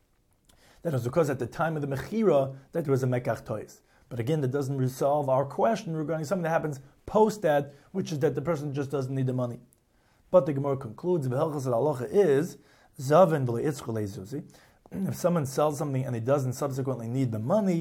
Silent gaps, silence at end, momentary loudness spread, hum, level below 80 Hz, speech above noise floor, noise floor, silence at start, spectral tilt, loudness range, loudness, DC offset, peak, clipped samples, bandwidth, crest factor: none; 0 s; 11 LU; none; -62 dBFS; 38 dB; -65 dBFS; 0.85 s; -7 dB/octave; 3 LU; -28 LUFS; under 0.1%; -8 dBFS; under 0.1%; 16.5 kHz; 20 dB